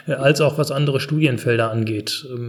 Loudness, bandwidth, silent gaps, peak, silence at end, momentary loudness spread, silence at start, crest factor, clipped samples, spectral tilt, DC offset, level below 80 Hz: -19 LUFS; 14.5 kHz; none; -2 dBFS; 0 s; 7 LU; 0.05 s; 18 dB; under 0.1%; -5.5 dB/octave; under 0.1%; -64 dBFS